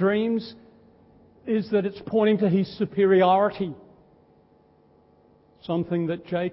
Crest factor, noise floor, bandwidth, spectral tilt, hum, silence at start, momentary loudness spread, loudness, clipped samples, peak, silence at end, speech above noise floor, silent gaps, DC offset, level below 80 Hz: 16 dB; -59 dBFS; 5.8 kHz; -11.5 dB/octave; none; 0 s; 14 LU; -24 LUFS; under 0.1%; -8 dBFS; 0 s; 36 dB; none; under 0.1%; -62 dBFS